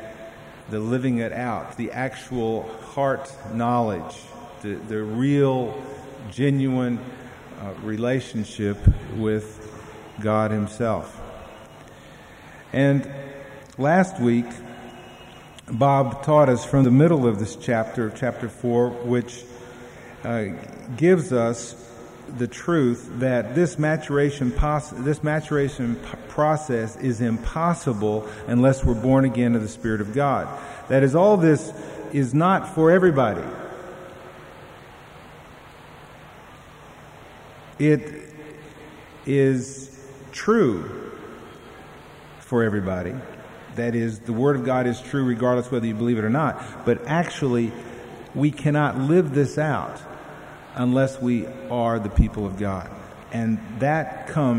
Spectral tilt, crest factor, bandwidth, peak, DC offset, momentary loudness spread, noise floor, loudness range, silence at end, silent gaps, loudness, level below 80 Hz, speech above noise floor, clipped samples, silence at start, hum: -7.5 dB/octave; 20 dB; 12 kHz; -4 dBFS; under 0.1%; 22 LU; -45 dBFS; 7 LU; 0 s; none; -23 LUFS; -40 dBFS; 23 dB; under 0.1%; 0 s; none